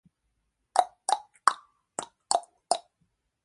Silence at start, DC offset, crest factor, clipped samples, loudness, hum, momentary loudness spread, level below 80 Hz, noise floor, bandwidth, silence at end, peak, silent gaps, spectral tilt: 0.75 s; under 0.1%; 30 dB; under 0.1%; -30 LUFS; none; 12 LU; -78 dBFS; -78 dBFS; 11.5 kHz; 0.65 s; -2 dBFS; none; 0.5 dB/octave